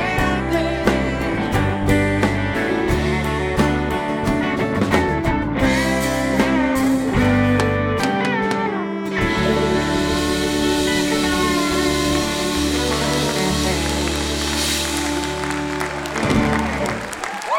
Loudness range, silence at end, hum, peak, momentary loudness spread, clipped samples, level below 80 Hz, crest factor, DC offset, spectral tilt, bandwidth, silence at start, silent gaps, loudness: 2 LU; 0 s; none; -2 dBFS; 4 LU; under 0.1%; -32 dBFS; 18 dB; under 0.1%; -4.5 dB/octave; 18.5 kHz; 0 s; none; -19 LUFS